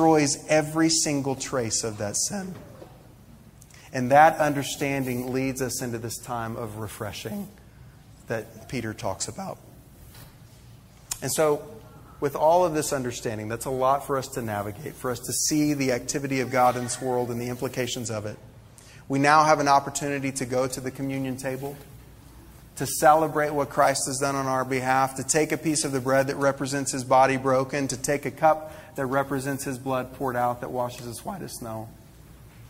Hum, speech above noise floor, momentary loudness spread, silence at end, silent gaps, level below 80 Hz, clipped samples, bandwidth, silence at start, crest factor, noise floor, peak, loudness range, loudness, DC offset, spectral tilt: none; 25 dB; 15 LU; 0 s; none; -54 dBFS; under 0.1%; 16 kHz; 0 s; 22 dB; -50 dBFS; -4 dBFS; 9 LU; -25 LUFS; under 0.1%; -4 dB/octave